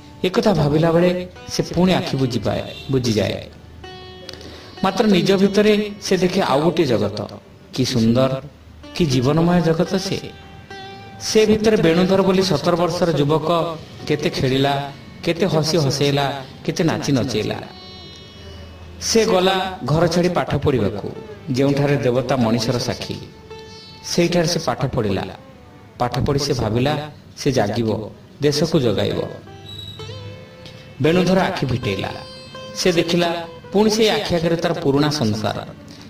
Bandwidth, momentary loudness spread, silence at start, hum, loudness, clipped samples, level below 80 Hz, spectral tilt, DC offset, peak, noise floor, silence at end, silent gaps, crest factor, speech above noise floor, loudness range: 16 kHz; 20 LU; 0 s; none; -19 LUFS; under 0.1%; -44 dBFS; -5.5 dB/octave; under 0.1%; -4 dBFS; -42 dBFS; 0 s; none; 16 dB; 24 dB; 4 LU